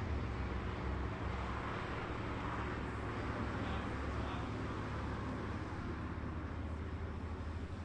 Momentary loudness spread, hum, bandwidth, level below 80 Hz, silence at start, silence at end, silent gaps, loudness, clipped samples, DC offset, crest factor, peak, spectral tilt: 3 LU; none; 9.4 kHz; -46 dBFS; 0 s; 0 s; none; -42 LUFS; under 0.1%; under 0.1%; 14 dB; -28 dBFS; -7 dB/octave